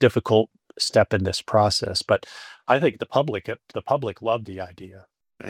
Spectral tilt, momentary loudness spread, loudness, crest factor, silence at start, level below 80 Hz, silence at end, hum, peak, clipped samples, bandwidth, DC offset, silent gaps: -5 dB/octave; 14 LU; -23 LUFS; 20 dB; 0 s; -58 dBFS; 0 s; none; -4 dBFS; under 0.1%; 16 kHz; under 0.1%; none